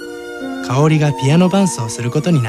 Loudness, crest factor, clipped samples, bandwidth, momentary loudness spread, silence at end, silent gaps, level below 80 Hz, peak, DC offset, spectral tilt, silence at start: -15 LUFS; 12 dB; under 0.1%; 13.5 kHz; 13 LU; 0 s; none; -50 dBFS; -2 dBFS; under 0.1%; -6 dB/octave; 0 s